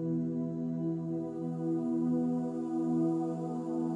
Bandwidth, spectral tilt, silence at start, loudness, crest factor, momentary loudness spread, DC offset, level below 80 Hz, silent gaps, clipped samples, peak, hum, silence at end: 8.8 kHz; -10.5 dB/octave; 0 s; -33 LUFS; 12 dB; 5 LU; under 0.1%; -74 dBFS; none; under 0.1%; -20 dBFS; none; 0 s